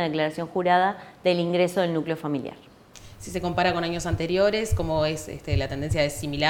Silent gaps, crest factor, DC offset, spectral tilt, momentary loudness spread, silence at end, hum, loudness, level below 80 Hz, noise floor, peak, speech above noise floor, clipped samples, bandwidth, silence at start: none; 18 dB; under 0.1%; -5.5 dB/octave; 8 LU; 0 s; none; -25 LUFS; -42 dBFS; -47 dBFS; -6 dBFS; 23 dB; under 0.1%; 18.5 kHz; 0 s